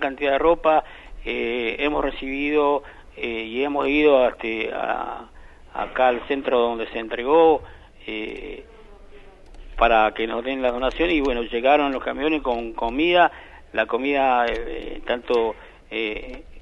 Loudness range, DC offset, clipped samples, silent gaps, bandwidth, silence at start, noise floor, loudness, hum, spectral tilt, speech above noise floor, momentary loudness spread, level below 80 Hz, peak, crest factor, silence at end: 3 LU; under 0.1%; under 0.1%; none; 7 kHz; 0 s; -44 dBFS; -22 LUFS; none; -6 dB/octave; 22 dB; 15 LU; -40 dBFS; -4 dBFS; 20 dB; 0 s